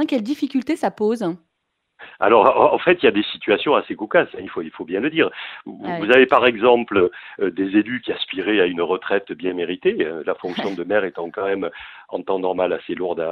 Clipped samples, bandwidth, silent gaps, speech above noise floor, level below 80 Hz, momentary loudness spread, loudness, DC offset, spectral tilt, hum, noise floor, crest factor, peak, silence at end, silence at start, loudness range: under 0.1%; 11 kHz; none; 55 dB; -60 dBFS; 13 LU; -19 LUFS; under 0.1%; -6 dB/octave; none; -75 dBFS; 20 dB; 0 dBFS; 0 s; 0 s; 6 LU